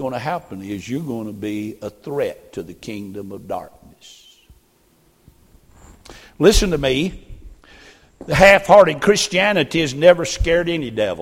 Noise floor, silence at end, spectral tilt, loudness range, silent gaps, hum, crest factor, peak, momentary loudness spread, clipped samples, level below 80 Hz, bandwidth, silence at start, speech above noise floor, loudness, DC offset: -57 dBFS; 0 s; -4.5 dB/octave; 20 LU; none; none; 20 dB; 0 dBFS; 20 LU; under 0.1%; -34 dBFS; 16.5 kHz; 0 s; 40 dB; -17 LUFS; under 0.1%